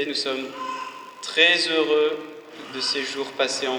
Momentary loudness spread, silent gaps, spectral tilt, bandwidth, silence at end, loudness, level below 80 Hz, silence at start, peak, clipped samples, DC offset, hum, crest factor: 19 LU; none; -1 dB/octave; 19.5 kHz; 0 s; -22 LUFS; -78 dBFS; 0 s; -2 dBFS; under 0.1%; under 0.1%; none; 22 dB